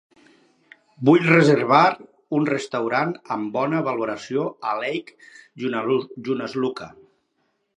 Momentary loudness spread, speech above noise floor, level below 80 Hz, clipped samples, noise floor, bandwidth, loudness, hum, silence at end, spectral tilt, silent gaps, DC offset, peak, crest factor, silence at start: 13 LU; 50 dB; -70 dBFS; under 0.1%; -71 dBFS; 10.5 kHz; -21 LUFS; none; 0.9 s; -6.5 dB/octave; none; under 0.1%; 0 dBFS; 22 dB; 1 s